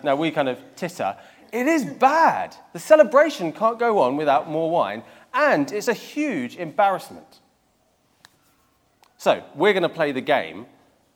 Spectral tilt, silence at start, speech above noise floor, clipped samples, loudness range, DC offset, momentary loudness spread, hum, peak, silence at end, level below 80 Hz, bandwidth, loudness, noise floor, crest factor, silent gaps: -5 dB/octave; 0.05 s; 43 dB; under 0.1%; 8 LU; under 0.1%; 15 LU; none; -2 dBFS; 0.5 s; -74 dBFS; 17.5 kHz; -21 LUFS; -64 dBFS; 22 dB; none